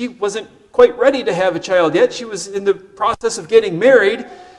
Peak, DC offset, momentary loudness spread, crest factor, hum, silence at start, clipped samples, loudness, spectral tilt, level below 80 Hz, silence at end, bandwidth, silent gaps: 0 dBFS; under 0.1%; 11 LU; 16 dB; none; 0 s; 0.1%; -15 LUFS; -4 dB/octave; -52 dBFS; 0.15 s; 11.5 kHz; none